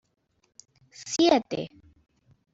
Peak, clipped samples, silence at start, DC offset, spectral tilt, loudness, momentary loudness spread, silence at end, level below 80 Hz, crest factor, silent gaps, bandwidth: -8 dBFS; under 0.1%; 1 s; under 0.1%; -3.5 dB/octave; -25 LUFS; 20 LU; 0.85 s; -66 dBFS; 22 dB; none; 8 kHz